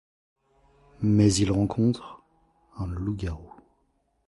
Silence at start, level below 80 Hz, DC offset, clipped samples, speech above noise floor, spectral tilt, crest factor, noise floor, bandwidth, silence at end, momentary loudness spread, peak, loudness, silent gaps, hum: 1 s; -44 dBFS; under 0.1%; under 0.1%; 46 dB; -6.5 dB/octave; 20 dB; -70 dBFS; 11.5 kHz; 0.8 s; 16 LU; -8 dBFS; -26 LUFS; none; none